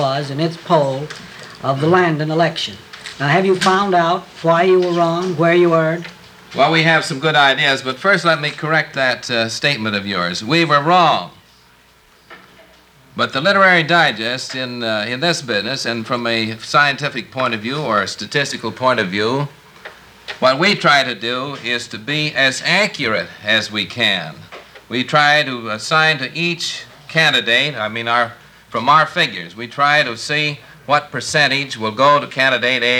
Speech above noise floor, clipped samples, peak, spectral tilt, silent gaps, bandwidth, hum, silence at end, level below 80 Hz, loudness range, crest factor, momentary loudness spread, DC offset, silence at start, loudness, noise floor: 34 dB; under 0.1%; 0 dBFS; -4 dB/octave; none; 19.5 kHz; none; 0 s; -60 dBFS; 3 LU; 16 dB; 10 LU; under 0.1%; 0 s; -16 LUFS; -50 dBFS